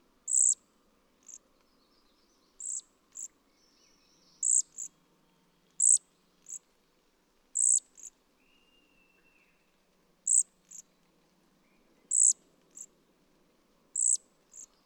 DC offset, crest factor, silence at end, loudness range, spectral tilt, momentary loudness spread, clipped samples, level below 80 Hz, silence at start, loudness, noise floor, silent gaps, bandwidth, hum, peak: under 0.1%; 22 dB; 0.2 s; 5 LU; 2.5 dB/octave; 27 LU; under 0.1%; -78 dBFS; 0.25 s; -26 LUFS; -70 dBFS; none; 18 kHz; none; -14 dBFS